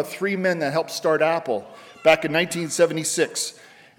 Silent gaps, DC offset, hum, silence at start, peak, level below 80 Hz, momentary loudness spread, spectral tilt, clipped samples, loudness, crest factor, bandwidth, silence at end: none; under 0.1%; none; 0 s; -6 dBFS; -68 dBFS; 8 LU; -3.5 dB/octave; under 0.1%; -22 LUFS; 18 dB; 19 kHz; 0.45 s